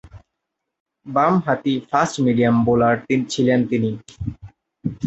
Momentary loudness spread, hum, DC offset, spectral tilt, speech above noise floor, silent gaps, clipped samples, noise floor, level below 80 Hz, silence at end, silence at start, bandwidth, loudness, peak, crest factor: 14 LU; none; under 0.1%; -6.5 dB/octave; 61 dB; 0.80-0.86 s; under 0.1%; -80 dBFS; -48 dBFS; 0 s; 0.15 s; 8.2 kHz; -19 LUFS; -2 dBFS; 18 dB